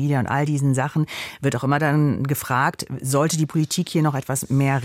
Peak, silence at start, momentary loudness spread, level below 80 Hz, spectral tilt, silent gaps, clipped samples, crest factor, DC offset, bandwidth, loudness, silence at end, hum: -6 dBFS; 0 s; 5 LU; -56 dBFS; -5.5 dB/octave; none; under 0.1%; 14 dB; under 0.1%; 16.5 kHz; -22 LUFS; 0 s; none